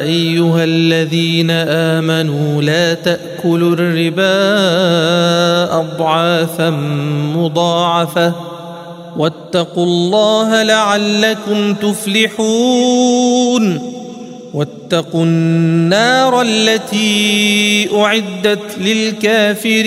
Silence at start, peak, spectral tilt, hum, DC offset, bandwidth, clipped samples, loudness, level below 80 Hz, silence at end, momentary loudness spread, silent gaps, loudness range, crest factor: 0 s; 0 dBFS; -5 dB/octave; none; under 0.1%; 15.5 kHz; under 0.1%; -13 LUFS; -60 dBFS; 0 s; 7 LU; none; 3 LU; 12 dB